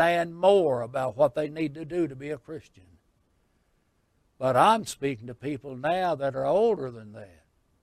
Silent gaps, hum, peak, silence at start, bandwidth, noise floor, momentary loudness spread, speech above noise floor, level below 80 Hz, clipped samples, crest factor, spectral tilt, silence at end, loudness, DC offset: none; none; -6 dBFS; 0 s; 15 kHz; -70 dBFS; 16 LU; 44 dB; -64 dBFS; under 0.1%; 20 dB; -5.5 dB/octave; 0.55 s; -26 LUFS; under 0.1%